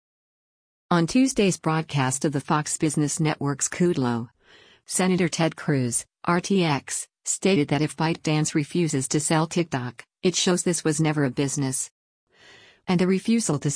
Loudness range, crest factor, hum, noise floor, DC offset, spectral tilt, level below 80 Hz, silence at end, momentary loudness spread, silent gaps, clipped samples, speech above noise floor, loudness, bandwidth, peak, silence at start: 1 LU; 16 dB; none; -55 dBFS; under 0.1%; -4.5 dB/octave; -58 dBFS; 0 s; 6 LU; 11.91-12.27 s; under 0.1%; 31 dB; -24 LUFS; 10.5 kHz; -8 dBFS; 0.9 s